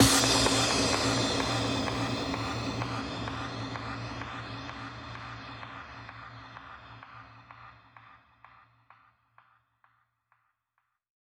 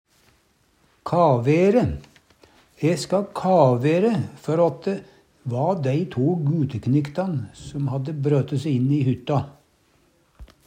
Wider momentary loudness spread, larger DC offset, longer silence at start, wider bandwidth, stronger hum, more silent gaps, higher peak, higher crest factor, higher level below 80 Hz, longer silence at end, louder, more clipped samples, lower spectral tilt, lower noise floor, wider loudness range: first, 24 LU vs 11 LU; neither; second, 0 s vs 1.05 s; first, over 20 kHz vs 10.5 kHz; neither; neither; second, -8 dBFS vs -4 dBFS; first, 24 dB vs 18 dB; about the same, -50 dBFS vs -52 dBFS; first, 3.1 s vs 0.2 s; second, -29 LUFS vs -22 LUFS; neither; second, -3 dB/octave vs -8 dB/octave; first, -80 dBFS vs -62 dBFS; first, 23 LU vs 4 LU